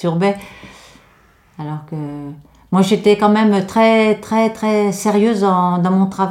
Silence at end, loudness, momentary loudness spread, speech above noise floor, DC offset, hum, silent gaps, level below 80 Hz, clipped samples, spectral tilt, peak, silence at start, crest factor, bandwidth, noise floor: 0 s; -15 LUFS; 15 LU; 36 dB; under 0.1%; none; none; -54 dBFS; under 0.1%; -6.5 dB/octave; -2 dBFS; 0 s; 14 dB; 15 kHz; -51 dBFS